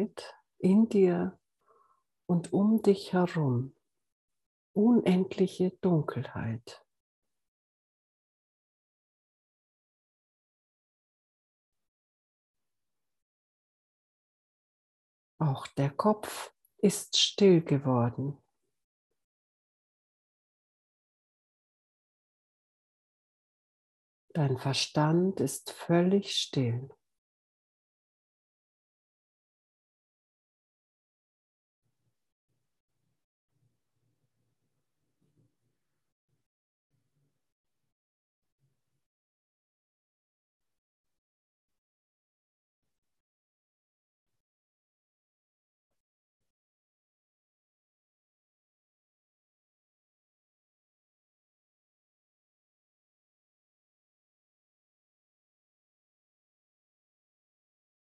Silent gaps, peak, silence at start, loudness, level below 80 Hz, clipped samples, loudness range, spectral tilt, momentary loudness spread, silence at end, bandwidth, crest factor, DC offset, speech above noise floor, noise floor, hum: 4.12-4.28 s, 4.46-4.74 s, 7.00-7.22 s, 7.48-11.72 s, 11.88-12.54 s, 13.22-15.38 s, 18.84-19.10 s, 19.24-24.28 s; -12 dBFS; 0 s; -28 LUFS; -78 dBFS; under 0.1%; 12 LU; -6 dB/octave; 13 LU; 31.25 s; 12 kHz; 24 dB; under 0.1%; over 63 dB; under -90 dBFS; none